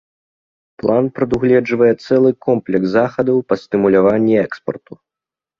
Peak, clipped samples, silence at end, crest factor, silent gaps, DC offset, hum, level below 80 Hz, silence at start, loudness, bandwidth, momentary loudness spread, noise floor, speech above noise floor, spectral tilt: 0 dBFS; under 0.1%; 0.8 s; 16 dB; none; under 0.1%; none; -50 dBFS; 0.85 s; -15 LUFS; 7 kHz; 9 LU; -88 dBFS; 73 dB; -8.5 dB/octave